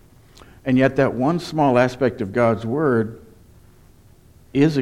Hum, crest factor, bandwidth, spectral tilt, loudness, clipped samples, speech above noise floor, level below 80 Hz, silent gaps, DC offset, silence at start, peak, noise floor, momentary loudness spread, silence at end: none; 16 dB; 12.5 kHz; -7.5 dB/octave; -20 LUFS; under 0.1%; 31 dB; -52 dBFS; none; under 0.1%; 0.65 s; -4 dBFS; -50 dBFS; 6 LU; 0 s